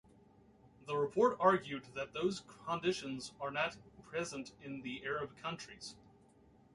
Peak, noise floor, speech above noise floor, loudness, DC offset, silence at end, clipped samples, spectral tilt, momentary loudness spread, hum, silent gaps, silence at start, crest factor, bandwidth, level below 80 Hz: -16 dBFS; -65 dBFS; 28 dB; -38 LUFS; under 0.1%; 0.8 s; under 0.1%; -4.5 dB/octave; 16 LU; none; none; 0.8 s; 24 dB; 11.5 kHz; -72 dBFS